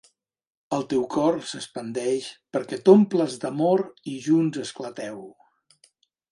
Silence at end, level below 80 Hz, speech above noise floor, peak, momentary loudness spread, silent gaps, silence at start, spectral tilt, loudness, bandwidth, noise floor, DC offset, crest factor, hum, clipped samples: 1.05 s; -70 dBFS; 40 dB; -2 dBFS; 17 LU; none; 0.7 s; -6 dB/octave; -24 LUFS; 11.5 kHz; -63 dBFS; under 0.1%; 22 dB; none; under 0.1%